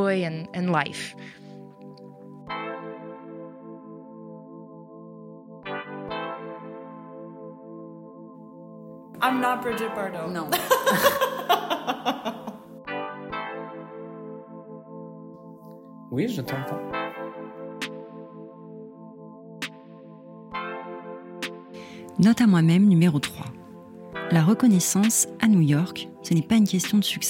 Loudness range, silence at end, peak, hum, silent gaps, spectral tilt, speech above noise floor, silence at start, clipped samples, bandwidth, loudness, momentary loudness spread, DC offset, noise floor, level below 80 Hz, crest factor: 18 LU; 0 s; -6 dBFS; none; none; -5 dB/octave; 23 dB; 0 s; under 0.1%; 16.5 kHz; -24 LUFS; 25 LU; under 0.1%; -45 dBFS; -64 dBFS; 20 dB